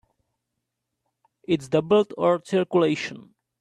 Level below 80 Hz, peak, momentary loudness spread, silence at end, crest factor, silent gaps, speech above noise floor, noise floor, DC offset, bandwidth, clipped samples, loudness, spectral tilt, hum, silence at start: -66 dBFS; -6 dBFS; 9 LU; 0.4 s; 18 dB; none; 59 dB; -81 dBFS; under 0.1%; 11 kHz; under 0.1%; -23 LUFS; -6.5 dB/octave; none; 1.5 s